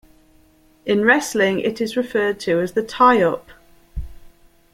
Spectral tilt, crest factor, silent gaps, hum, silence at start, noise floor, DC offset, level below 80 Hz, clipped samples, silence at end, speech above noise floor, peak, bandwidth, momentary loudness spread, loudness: -4.5 dB/octave; 18 dB; none; none; 0.85 s; -54 dBFS; under 0.1%; -42 dBFS; under 0.1%; 0.6 s; 36 dB; -2 dBFS; 16.5 kHz; 20 LU; -18 LUFS